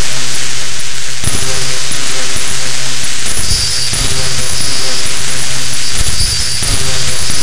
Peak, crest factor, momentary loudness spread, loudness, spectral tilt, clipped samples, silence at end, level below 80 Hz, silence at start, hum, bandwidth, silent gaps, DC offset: 0 dBFS; 14 dB; 4 LU; -14 LUFS; -1 dB/octave; under 0.1%; 0 s; -26 dBFS; 0 s; none; 16.5 kHz; none; 60%